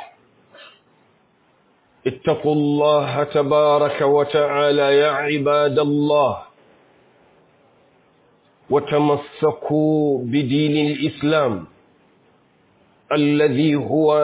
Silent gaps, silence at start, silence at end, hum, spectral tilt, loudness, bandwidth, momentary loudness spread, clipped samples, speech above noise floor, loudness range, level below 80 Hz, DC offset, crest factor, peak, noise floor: none; 0 s; 0 s; none; -10.5 dB/octave; -18 LUFS; 4 kHz; 6 LU; under 0.1%; 41 dB; 7 LU; -60 dBFS; under 0.1%; 14 dB; -6 dBFS; -59 dBFS